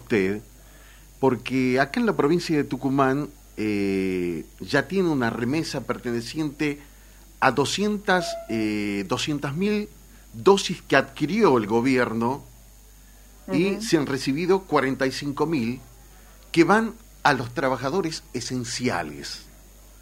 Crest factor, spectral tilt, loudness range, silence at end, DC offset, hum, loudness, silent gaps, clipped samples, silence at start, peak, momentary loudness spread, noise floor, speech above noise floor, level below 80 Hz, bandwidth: 22 dB; -5 dB/octave; 3 LU; 0.5 s; under 0.1%; none; -24 LUFS; none; under 0.1%; 0 s; -2 dBFS; 9 LU; -49 dBFS; 25 dB; -50 dBFS; 16 kHz